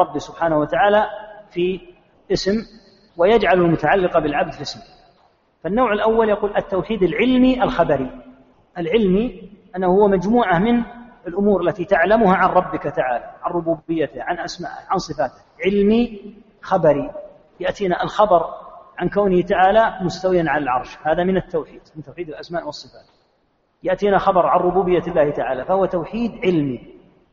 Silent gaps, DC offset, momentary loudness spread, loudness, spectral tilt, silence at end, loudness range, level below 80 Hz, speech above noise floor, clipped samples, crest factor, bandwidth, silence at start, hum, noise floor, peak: none; under 0.1%; 15 LU; -19 LUFS; -5 dB/octave; 0.4 s; 4 LU; -44 dBFS; 46 dB; under 0.1%; 18 dB; 7.4 kHz; 0 s; none; -64 dBFS; -2 dBFS